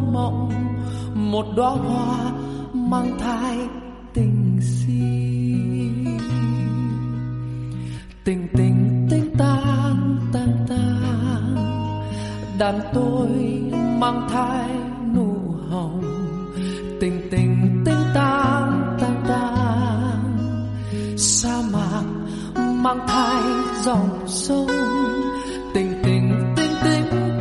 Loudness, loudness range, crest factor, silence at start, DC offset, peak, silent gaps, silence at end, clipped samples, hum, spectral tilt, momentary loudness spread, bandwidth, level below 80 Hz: -21 LUFS; 3 LU; 16 dB; 0 s; under 0.1%; -4 dBFS; none; 0 s; under 0.1%; none; -6 dB/octave; 9 LU; 11.5 kHz; -40 dBFS